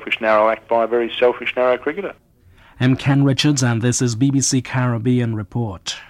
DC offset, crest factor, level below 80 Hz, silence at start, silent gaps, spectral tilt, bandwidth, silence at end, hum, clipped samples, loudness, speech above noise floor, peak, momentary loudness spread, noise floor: under 0.1%; 14 dB; -52 dBFS; 0 s; none; -5 dB/octave; 13 kHz; 0.05 s; none; under 0.1%; -18 LUFS; 32 dB; -4 dBFS; 9 LU; -49 dBFS